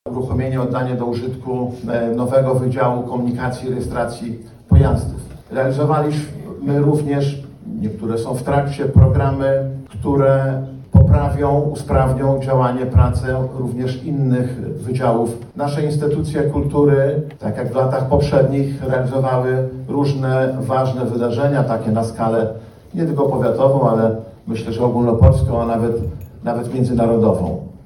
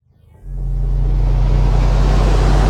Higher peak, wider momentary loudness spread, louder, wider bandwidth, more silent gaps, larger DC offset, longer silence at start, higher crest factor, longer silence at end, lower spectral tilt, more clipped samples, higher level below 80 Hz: about the same, 0 dBFS vs -2 dBFS; about the same, 10 LU vs 10 LU; about the same, -18 LUFS vs -17 LUFS; first, 12 kHz vs 8.2 kHz; neither; neither; second, 0.05 s vs 0.45 s; first, 16 dB vs 10 dB; about the same, 0.1 s vs 0 s; first, -8.5 dB/octave vs -7 dB/octave; neither; second, -30 dBFS vs -14 dBFS